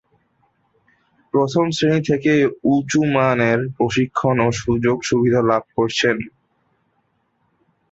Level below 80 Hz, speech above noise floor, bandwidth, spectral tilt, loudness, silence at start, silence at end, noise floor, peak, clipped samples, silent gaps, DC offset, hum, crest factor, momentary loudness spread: -50 dBFS; 49 dB; 8 kHz; -6 dB/octave; -18 LUFS; 1.35 s; 1.65 s; -66 dBFS; -2 dBFS; under 0.1%; none; under 0.1%; none; 16 dB; 4 LU